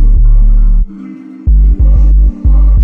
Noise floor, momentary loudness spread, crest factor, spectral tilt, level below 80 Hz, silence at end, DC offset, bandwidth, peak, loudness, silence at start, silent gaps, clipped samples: -27 dBFS; 11 LU; 4 dB; -11.5 dB/octave; -6 dBFS; 0 s; under 0.1%; 1.4 kHz; 0 dBFS; -11 LUFS; 0 s; none; under 0.1%